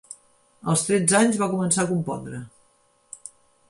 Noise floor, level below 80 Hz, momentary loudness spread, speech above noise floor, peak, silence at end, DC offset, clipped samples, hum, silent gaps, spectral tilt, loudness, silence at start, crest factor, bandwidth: -63 dBFS; -62 dBFS; 25 LU; 41 dB; -6 dBFS; 0.4 s; under 0.1%; under 0.1%; none; none; -4.5 dB/octave; -22 LUFS; 0.1 s; 20 dB; 11.5 kHz